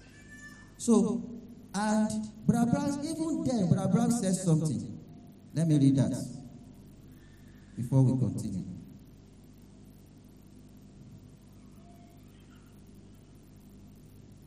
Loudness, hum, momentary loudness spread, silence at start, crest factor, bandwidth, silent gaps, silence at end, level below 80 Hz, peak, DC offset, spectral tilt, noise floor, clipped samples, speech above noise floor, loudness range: -29 LUFS; 50 Hz at -55 dBFS; 25 LU; 0.15 s; 20 dB; 13.5 kHz; none; 0.15 s; -60 dBFS; -12 dBFS; under 0.1%; -7 dB/octave; -54 dBFS; under 0.1%; 26 dB; 5 LU